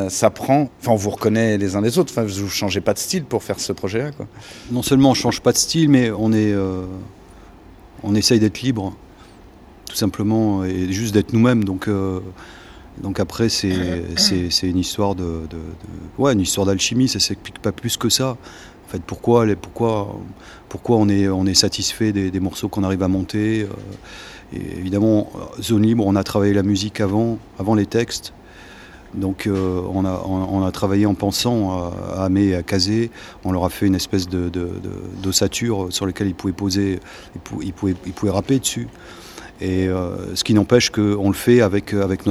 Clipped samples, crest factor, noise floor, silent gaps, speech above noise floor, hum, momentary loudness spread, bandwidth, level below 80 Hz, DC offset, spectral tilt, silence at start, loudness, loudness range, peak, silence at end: under 0.1%; 20 dB; -44 dBFS; none; 24 dB; none; 16 LU; 15.5 kHz; -44 dBFS; under 0.1%; -5 dB/octave; 0 s; -19 LUFS; 4 LU; 0 dBFS; 0 s